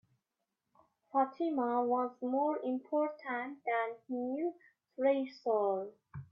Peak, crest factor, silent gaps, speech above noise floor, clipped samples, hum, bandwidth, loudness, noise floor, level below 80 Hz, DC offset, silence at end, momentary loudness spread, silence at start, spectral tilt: -18 dBFS; 16 dB; none; 53 dB; under 0.1%; none; 6 kHz; -35 LUFS; -87 dBFS; -82 dBFS; under 0.1%; 0.1 s; 7 LU; 1.15 s; -8 dB/octave